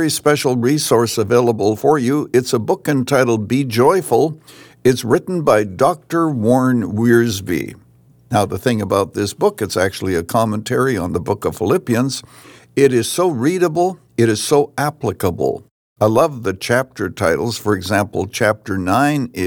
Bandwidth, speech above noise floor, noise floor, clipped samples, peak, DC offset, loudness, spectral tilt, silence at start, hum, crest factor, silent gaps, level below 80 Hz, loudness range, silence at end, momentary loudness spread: over 20 kHz; 33 dB; -49 dBFS; under 0.1%; -2 dBFS; under 0.1%; -17 LUFS; -5.5 dB/octave; 0 s; none; 16 dB; 15.71-15.96 s; -54 dBFS; 3 LU; 0 s; 7 LU